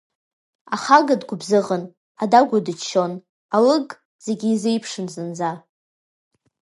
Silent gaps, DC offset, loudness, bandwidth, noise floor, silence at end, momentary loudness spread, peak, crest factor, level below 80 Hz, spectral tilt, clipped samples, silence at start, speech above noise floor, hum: 1.97-2.15 s, 3.29-3.49 s, 4.05-4.19 s; under 0.1%; -20 LUFS; 11.5 kHz; under -90 dBFS; 1.05 s; 14 LU; 0 dBFS; 20 dB; -72 dBFS; -5 dB/octave; under 0.1%; 0.7 s; over 71 dB; none